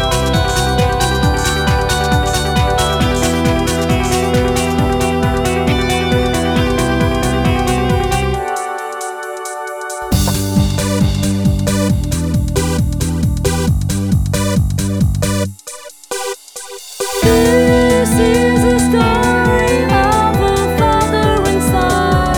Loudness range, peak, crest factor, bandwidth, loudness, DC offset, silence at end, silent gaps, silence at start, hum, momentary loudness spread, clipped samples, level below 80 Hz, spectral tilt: 5 LU; 0 dBFS; 14 dB; 19.5 kHz; -14 LUFS; under 0.1%; 0 s; none; 0 s; none; 10 LU; under 0.1%; -24 dBFS; -5 dB/octave